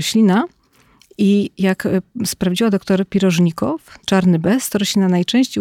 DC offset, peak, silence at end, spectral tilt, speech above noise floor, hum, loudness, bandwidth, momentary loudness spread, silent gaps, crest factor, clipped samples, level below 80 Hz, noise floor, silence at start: under 0.1%; -4 dBFS; 0 s; -5.5 dB/octave; 37 dB; none; -17 LUFS; 16.5 kHz; 6 LU; none; 12 dB; under 0.1%; -52 dBFS; -53 dBFS; 0 s